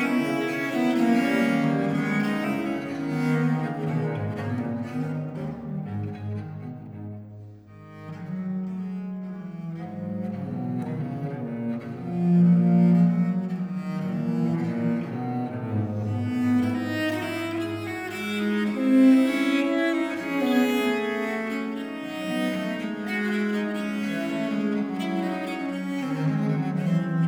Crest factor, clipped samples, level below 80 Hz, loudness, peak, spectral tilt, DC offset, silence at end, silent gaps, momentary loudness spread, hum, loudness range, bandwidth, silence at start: 18 dB; under 0.1%; -66 dBFS; -26 LUFS; -8 dBFS; -7.5 dB/octave; under 0.1%; 0 s; none; 13 LU; none; 11 LU; 17 kHz; 0 s